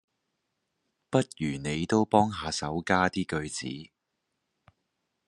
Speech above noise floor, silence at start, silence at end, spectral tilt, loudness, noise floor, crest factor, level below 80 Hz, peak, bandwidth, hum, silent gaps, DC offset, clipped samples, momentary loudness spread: 54 dB; 1.1 s; 1.4 s; -5 dB/octave; -28 LUFS; -82 dBFS; 24 dB; -60 dBFS; -6 dBFS; 11.5 kHz; none; none; under 0.1%; under 0.1%; 11 LU